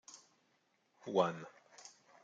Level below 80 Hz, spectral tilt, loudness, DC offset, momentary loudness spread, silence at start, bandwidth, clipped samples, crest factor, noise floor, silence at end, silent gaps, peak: -88 dBFS; -5 dB/octave; -36 LUFS; under 0.1%; 22 LU; 0.1 s; 9.2 kHz; under 0.1%; 26 dB; -77 dBFS; 0.35 s; none; -16 dBFS